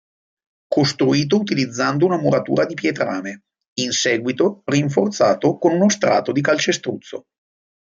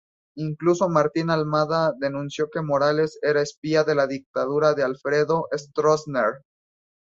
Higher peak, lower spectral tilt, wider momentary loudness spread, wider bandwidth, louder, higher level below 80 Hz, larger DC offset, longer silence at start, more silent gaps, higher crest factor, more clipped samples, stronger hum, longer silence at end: first, -2 dBFS vs -6 dBFS; second, -4.5 dB/octave vs -6 dB/octave; first, 10 LU vs 7 LU; about the same, 7.8 kHz vs 7.8 kHz; first, -19 LUFS vs -23 LUFS; about the same, -62 dBFS vs -64 dBFS; neither; first, 0.7 s vs 0.35 s; about the same, 3.68-3.76 s vs 3.57-3.62 s, 4.26-4.34 s; about the same, 16 dB vs 18 dB; neither; neither; about the same, 0.7 s vs 0.6 s